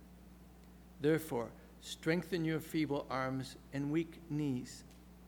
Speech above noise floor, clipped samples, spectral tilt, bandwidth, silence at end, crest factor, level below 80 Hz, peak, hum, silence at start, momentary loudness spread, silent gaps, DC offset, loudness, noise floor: 20 dB; under 0.1%; -6 dB/octave; over 20 kHz; 0 s; 20 dB; -62 dBFS; -18 dBFS; none; 0 s; 23 LU; none; under 0.1%; -38 LUFS; -57 dBFS